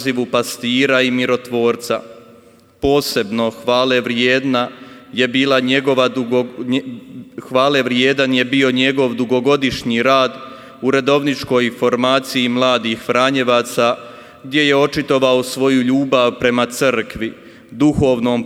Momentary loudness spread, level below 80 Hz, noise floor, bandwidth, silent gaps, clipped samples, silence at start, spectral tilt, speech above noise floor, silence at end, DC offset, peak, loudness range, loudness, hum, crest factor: 8 LU; -48 dBFS; -46 dBFS; 16 kHz; none; under 0.1%; 0 s; -4.5 dB/octave; 31 dB; 0 s; under 0.1%; 0 dBFS; 2 LU; -16 LUFS; none; 16 dB